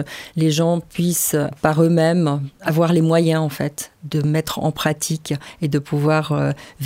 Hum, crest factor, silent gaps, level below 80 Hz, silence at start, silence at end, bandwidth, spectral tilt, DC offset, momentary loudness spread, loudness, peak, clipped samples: none; 18 dB; none; -52 dBFS; 0 s; 0 s; 16 kHz; -5.5 dB/octave; under 0.1%; 9 LU; -19 LUFS; -2 dBFS; under 0.1%